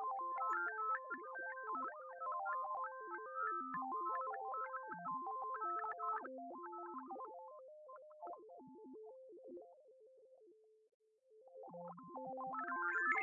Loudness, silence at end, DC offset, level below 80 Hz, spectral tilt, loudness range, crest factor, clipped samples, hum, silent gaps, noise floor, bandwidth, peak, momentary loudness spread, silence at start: -44 LUFS; 0 s; under 0.1%; under -90 dBFS; -4.5 dB/octave; 15 LU; 20 dB; under 0.1%; none; 10.94-11.00 s; -68 dBFS; 4.5 kHz; -26 dBFS; 17 LU; 0 s